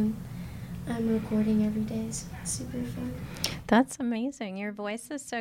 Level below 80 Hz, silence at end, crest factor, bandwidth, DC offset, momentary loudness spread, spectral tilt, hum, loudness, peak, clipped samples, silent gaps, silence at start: -50 dBFS; 0 s; 20 dB; 17 kHz; under 0.1%; 12 LU; -5 dB/octave; none; -31 LUFS; -10 dBFS; under 0.1%; none; 0 s